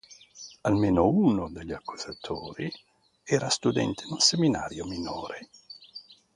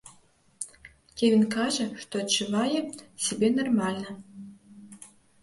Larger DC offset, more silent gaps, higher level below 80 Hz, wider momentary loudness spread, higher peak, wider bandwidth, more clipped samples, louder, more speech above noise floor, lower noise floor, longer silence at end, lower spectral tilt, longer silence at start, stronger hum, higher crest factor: neither; neither; first, -52 dBFS vs -66 dBFS; about the same, 23 LU vs 23 LU; first, -6 dBFS vs -12 dBFS; about the same, 11.5 kHz vs 11.5 kHz; neither; about the same, -27 LUFS vs -26 LUFS; second, 23 dB vs 34 dB; second, -50 dBFS vs -61 dBFS; second, 0.2 s vs 0.35 s; about the same, -4.5 dB/octave vs -4 dB/octave; about the same, 0.1 s vs 0.05 s; neither; about the same, 22 dB vs 18 dB